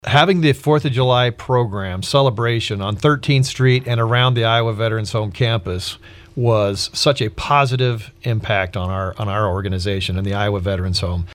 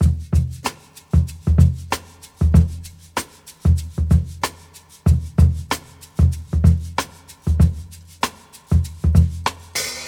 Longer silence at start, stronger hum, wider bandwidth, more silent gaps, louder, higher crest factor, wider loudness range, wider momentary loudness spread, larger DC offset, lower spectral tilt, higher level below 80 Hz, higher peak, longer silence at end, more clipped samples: about the same, 0.05 s vs 0 s; neither; second, 13.5 kHz vs 17 kHz; neither; about the same, -18 LUFS vs -20 LUFS; about the same, 18 dB vs 18 dB; about the same, 3 LU vs 2 LU; second, 8 LU vs 12 LU; neither; about the same, -5.5 dB/octave vs -6 dB/octave; second, -42 dBFS vs -24 dBFS; about the same, 0 dBFS vs 0 dBFS; about the same, 0 s vs 0 s; neither